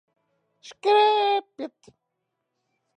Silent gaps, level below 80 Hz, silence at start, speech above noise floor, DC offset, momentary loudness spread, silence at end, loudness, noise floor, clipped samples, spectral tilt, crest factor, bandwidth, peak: none; -84 dBFS; 0.65 s; 57 dB; under 0.1%; 19 LU; 1.3 s; -21 LUFS; -80 dBFS; under 0.1%; -2 dB/octave; 16 dB; 9.2 kHz; -10 dBFS